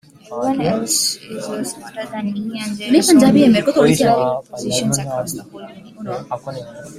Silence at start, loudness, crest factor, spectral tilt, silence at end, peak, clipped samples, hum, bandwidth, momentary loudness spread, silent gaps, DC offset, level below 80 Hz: 0.3 s; -17 LUFS; 16 dB; -4.5 dB/octave; 0 s; -2 dBFS; under 0.1%; none; 16 kHz; 19 LU; none; under 0.1%; -52 dBFS